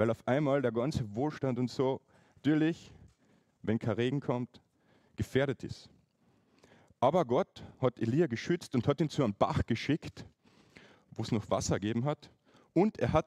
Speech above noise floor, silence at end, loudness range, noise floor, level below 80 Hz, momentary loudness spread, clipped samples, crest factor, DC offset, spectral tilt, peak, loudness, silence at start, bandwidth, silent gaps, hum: 39 dB; 0.05 s; 4 LU; -70 dBFS; -56 dBFS; 12 LU; under 0.1%; 20 dB; under 0.1%; -6.5 dB/octave; -12 dBFS; -32 LUFS; 0 s; 13 kHz; none; none